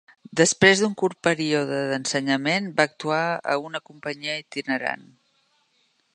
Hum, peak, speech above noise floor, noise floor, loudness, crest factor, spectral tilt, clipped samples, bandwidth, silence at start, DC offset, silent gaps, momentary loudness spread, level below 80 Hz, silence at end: none; 0 dBFS; 44 dB; -67 dBFS; -23 LUFS; 24 dB; -3.5 dB/octave; under 0.1%; 11.5 kHz; 0.3 s; under 0.1%; none; 14 LU; -66 dBFS; 1.15 s